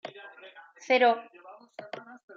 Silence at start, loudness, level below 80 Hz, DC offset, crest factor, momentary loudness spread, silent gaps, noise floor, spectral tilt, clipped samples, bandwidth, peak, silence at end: 0.05 s; -25 LUFS; under -90 dBFS; under 0.1%; 20 dB; 26 LU; none; -51 dBFS; -3 dB/octave; under 0.1%; 7.2 kHz; -12 dBFS; 0.25 s